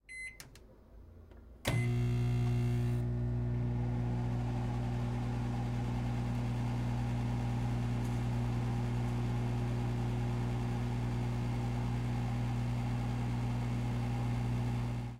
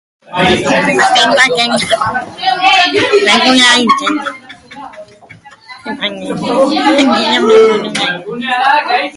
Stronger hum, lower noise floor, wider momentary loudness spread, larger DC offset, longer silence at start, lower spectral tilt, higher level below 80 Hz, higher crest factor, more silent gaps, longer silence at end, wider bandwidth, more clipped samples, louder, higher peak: neither; first, -56 dBFS vs -38 dBFS; second, 3 LU vs 12 LU; neither; second, 0.1 s vs 0.3 s; first, -7.5 dB/octave vs -3 dB/octave; about the same, -44 dBFS vs -46 dBFS; about the same, 16 dB vs 12 dB; neither; about the same, 0 s vs 0 s; about the same, 12 kHz vs 11.5 kHz; neither; second, -35 LUFS vs -10 LUFS; second, -18 dBFS vs 0 dBFS